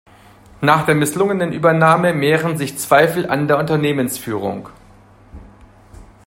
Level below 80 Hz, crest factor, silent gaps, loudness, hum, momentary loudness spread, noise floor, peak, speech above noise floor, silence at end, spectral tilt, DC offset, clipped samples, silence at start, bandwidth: -50 dBFS; 18 dB; none; -16 LUFS; none; 9 LU; -46 dBFS; 0 dBFS; 30 dB; 0.25 s; -5.5 dB/octave; under 0.1%; under 0.1%; 0.6 s; 16.5 kHz